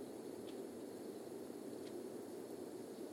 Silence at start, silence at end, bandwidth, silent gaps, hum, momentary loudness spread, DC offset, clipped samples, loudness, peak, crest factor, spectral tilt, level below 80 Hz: 0 s; 0 s; 16.5 kHz; none; none; 1 LU; under 0.1%; under 0.1%; -50 LUFS; -36 dBFS; 14 dB; -5 dB/octave; -90 dBFS